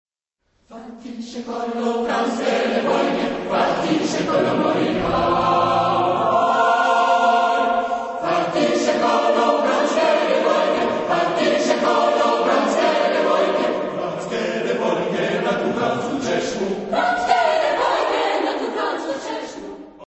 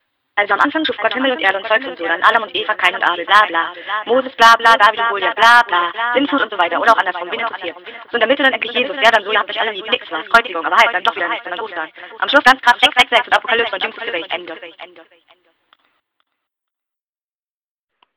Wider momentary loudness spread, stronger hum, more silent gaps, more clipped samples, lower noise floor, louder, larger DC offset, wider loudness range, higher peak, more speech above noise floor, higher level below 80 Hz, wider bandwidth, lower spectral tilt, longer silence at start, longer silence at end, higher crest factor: second, 8 LU vs 13 LU; neither; neither; second, under 0.1% vs 0.5%; second, -71 dBFS vs under -90 dBFS; second, -19 LUFS vs -14 LUFS; neither; about the same, 4 LU vs 6 LU; second, -4 dBFS vs 0 dBFS; second, 51 dB vs over 75 dB; first, -52 dBFS vs -58 dBFS; second, 8.4 kHz vs over 20 kHz; first, -4.5 dB/octave vs -1.5 dB/octave; first, 0.7 s vs 0.35 s; second, 0.05 s vs 3.15 s; about the same, 16 dB vs 16 dB